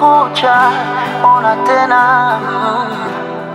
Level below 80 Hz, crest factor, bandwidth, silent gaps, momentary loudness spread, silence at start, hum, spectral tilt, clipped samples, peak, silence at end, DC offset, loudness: -60 dBFS; 12 dB; 13 kHz; none; 9 LU; 0 s; none; -5 dB/octave; under 0.1%; 0 dBFS; 0 s; under 0.1%; -12 LUFS